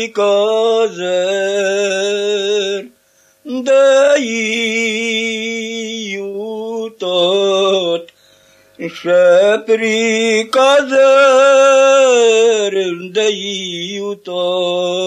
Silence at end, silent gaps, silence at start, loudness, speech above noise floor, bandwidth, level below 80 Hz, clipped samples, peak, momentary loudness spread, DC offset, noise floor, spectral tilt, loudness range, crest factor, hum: 0 s; none; 0 s; -13 LUFS; 41 dB; 11 kHz; -74 dBFS; under 0.1%; 0 dBFS; 14 LU; under 0.1%; -54 dBFS; -2.5 dB/octave; 7 LU; 14 dB; none